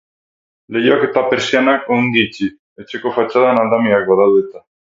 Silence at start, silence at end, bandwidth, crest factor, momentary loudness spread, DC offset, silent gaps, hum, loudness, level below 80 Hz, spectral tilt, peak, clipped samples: 0.7 s; 0.3 s; 7.8 kHz; 16 dB; 11 LU; under 0.1%; 2.59-2.76 s; none; -14 LUFS; -58 dBFS; -5.5 dB/octave; 0 dBFS; under 0.1%